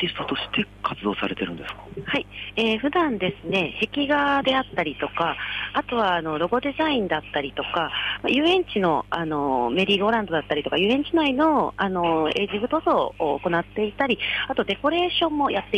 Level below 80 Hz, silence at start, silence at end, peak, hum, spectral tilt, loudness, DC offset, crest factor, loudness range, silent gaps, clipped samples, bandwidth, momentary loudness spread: -50 dBFS; 0 s; 0 s; -10 dBFS; 50 Hz at -45 dBFS; -6 dB/octave; -23 LUFS; under 0.1%; 14 dB; 3 LU; none; under 0.1%; 9.8 kHz; 7 LU